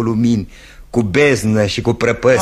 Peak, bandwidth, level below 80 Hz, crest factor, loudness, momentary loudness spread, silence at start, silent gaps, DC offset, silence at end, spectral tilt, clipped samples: 0 dBFS; 13 kHz; -38 dBFS; 14 dB; -15 LUFS; 8 LU; 0 s; none; under 0.1%; 0 s; -6 dB/octave; under 0.1%